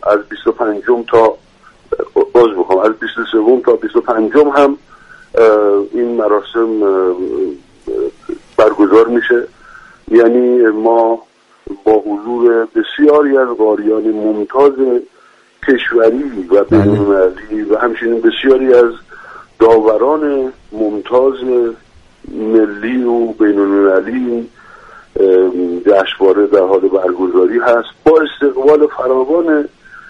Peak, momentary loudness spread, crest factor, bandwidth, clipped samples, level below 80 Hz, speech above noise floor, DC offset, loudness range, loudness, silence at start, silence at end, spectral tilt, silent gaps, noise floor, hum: 0 dBFS; 10 LU; 12 dB; 7.4 kHz; under 0.1%; -46 dBFS; 36 dB; under 0.1%; 2 LU; -12 LUFS; 0 s; 0.1 s; -7.5 dB/octave; none; -47 dBFS; none